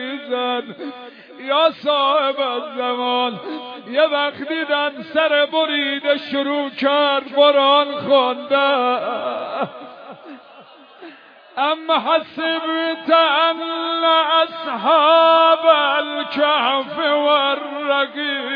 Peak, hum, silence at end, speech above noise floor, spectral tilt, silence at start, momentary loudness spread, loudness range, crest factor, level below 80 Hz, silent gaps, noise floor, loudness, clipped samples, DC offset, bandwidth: -2 dBFS; none; 0 s; 26 dB; -5.5 dB/octave; 0 s; 11 LU; 8 LU; 18 dB; -78 dBFS; none; -44 dBFS; -17 LUFS; under 0.1%; under 0.1%; 5.2 kHz